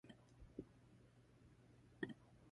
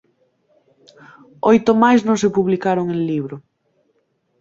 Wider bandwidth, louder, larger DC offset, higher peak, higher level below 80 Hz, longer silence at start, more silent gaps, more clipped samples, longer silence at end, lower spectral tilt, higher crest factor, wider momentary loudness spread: first, 11 kHz vs 7.8 kHz; second, -57 LUFS vs -16 LUFS; neither; second, -30 dBFS vs -2 dBFS; second, -74 dBFS vs -58 dBFS; second, 0.05 s vs 1.45 s; neither; neither; second, 0 s vs 1 s; about the same, -6.5 dB/octave vs -6.5 dB/octave; first, 28 dB vs 18 dB; first, 17 LU vs 11 LU